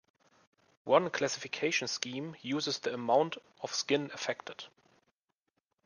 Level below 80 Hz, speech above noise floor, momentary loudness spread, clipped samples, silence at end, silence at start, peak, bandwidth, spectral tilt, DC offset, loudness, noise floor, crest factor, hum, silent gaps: -80 dBFS; 50 dB; 13 LU; under 0.1%; 1.2 s; 0.85 s; -10 dBFS; 10.5 kHz; -3 dB/octave; under 0.1%; -33 LUFS; -83 dBFS; 24 dB; none; none